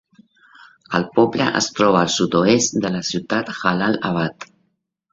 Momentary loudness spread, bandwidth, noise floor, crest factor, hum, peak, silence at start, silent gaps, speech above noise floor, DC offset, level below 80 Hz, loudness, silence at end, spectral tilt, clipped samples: 8 LU; 8 kHz; -70 dBFS; 20 dB; none; 0 dBFS; 0.9 s; none; 52 dB; under 0.1%; -56 dBFS; -19 LUFS; 0.7 s; -4 dB/octave; under 0.1%